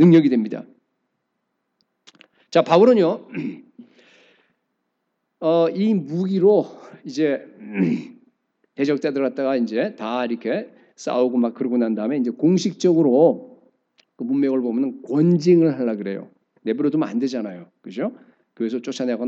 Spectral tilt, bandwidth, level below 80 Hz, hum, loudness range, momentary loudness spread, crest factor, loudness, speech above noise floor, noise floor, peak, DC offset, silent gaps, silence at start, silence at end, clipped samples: -7.5 dB/octave; 7.8 kHz; -88 dBFS; none; 4 LU; 16 LU; 20 dB; -20 LUFS; 56 dB; -75 dBFS; -2 dBFS; under 0.1%; none; 0 s; 0 s; under 0.1%